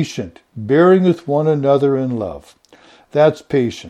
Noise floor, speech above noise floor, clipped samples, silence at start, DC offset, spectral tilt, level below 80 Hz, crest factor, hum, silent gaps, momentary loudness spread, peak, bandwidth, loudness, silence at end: -48 dBFS; 32 dB; under 0.1%; 0 s; under 0.1%; -7.5 dB/octave; -54 dBFS; 16 dB; none; none; 17 LU; 0 dBFS; 11 kHz; -15 LUFS; 0 s